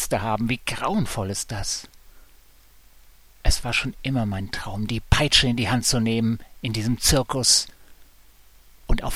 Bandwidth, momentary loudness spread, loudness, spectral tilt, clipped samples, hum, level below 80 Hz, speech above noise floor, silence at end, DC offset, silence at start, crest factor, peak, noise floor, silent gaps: 16 kHz; 12 LU; -23 LUFS; -3.5 dB/octave; under 0.1%; none; -32 dBFS; 31 dB; 0 s; 0.2%; 0 s; 22 dB; -2 dBFS; -54 dBFS; none